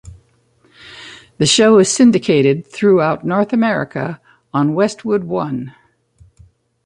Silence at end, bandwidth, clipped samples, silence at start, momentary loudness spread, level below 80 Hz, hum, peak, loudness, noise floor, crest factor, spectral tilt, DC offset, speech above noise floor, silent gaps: 1.15 s; 11.5 kHz; under 0.1%; 0.05 s; 24 LU; -52 dBFS; none; -2 dBFS; -15 LUFS; -56 dBFS; 14 dB; -4.5 dB/octave; under 0.1%; 42 dB; none